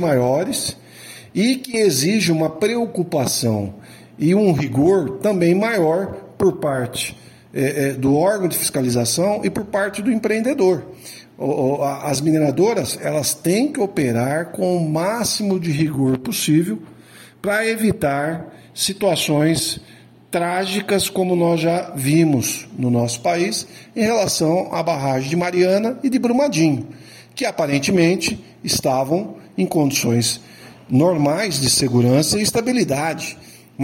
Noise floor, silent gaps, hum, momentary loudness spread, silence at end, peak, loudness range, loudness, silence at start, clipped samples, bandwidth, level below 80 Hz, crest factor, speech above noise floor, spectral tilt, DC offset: -44 dBFS; none; none; 9 LU; 0 s; -4 dBFS; 2 LU; -19 LUFS; 0 s; under 0.1%; 16.5 kHz; -54 dBFS; 14 dB; 26 dB; -4.5 dB/octave; under 0.1%